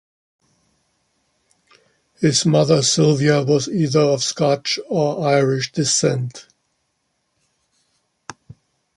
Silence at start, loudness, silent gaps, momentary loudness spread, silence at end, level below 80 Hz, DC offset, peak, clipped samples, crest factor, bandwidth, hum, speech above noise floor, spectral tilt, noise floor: 2.2 s; -17 LUFS; none; 12 LU; 2.55 s; -60 dBFS; under 0.1%; -2 dBFS; under 0.1%; 18 dB; 11.5 kHz; none; 53 dB; -4.5 dB/octave; -71 dBFS